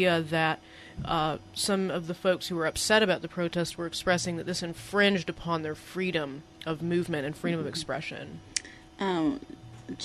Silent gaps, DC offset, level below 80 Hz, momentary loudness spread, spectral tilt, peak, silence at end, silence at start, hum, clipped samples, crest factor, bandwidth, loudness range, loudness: none; under 0.1%; -56 dBFS; 14 LU; -4 dB/octave; -8 dBFS; 0 s; 0 s; none; under 0.1%; 22 dB; 14 kHz; 5 LU; -29 LUFS